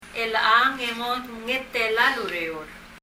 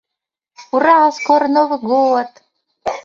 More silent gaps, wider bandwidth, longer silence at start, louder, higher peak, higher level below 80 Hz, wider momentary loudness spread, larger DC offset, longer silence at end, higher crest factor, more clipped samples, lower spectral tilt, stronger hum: neither; first, 16 kHz vs 7.6 kHz; second, 0 s vs 0.6 s; second, -23 LUFS vs -14 LUFS; second, -4 dBFS vs 0 dBFS; first, -56 dBFS vs -62 dBFS; about the same, 12 LU vs 14 LU; neither; about the same, 0.05 s vs 0.05 s; about the same, 20 dB vs 16 dB; neither; second, -2.5 dB/octave vs -4.5 dB/octave; neither